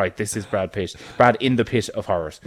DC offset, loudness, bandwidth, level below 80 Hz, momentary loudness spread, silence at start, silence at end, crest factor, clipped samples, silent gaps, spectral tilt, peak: under 0.1%; -22 LUFS; 15.5 kHz; -50 dBFS; 10 LU; 0 s; 0.1 s; 20 dB; under 0.1%; none; -5 dB/octave; -2 dBFS